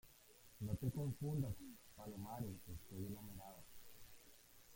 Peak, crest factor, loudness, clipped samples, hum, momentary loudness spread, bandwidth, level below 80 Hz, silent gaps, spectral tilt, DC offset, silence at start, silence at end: -30 dBFS; 20 dB; -48 LUFS; under 0.1%; none; 20 LU; 17 kHz; -66 dBFS; none; -7 dB/octave; under 0.1%; 0.05 s; 0 s